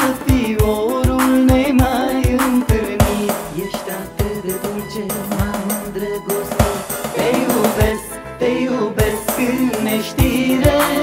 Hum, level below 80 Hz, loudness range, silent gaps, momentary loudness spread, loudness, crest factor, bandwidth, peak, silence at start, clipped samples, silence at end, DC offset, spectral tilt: none; -28 dBFS; 6 LU; none; 9 LU; -17 LUFS; 16 dB; 16.5 kHz; 0 dBFS; 0 s; under 0.1%; 0 s; under 0.1%; -5.5 dB/octave